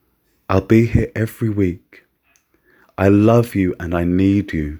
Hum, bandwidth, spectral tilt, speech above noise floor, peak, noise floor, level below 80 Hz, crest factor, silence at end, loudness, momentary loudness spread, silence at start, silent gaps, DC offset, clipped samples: none; over 20 kHz; -8.5 dB/octave; 45 dB; 0 dBFS; -61 dBFS; -36 dBFS; 18 dB; 0 s; -17 LUFS; 8 LU; 0.5 s; none; under 0.1%; under 0.1%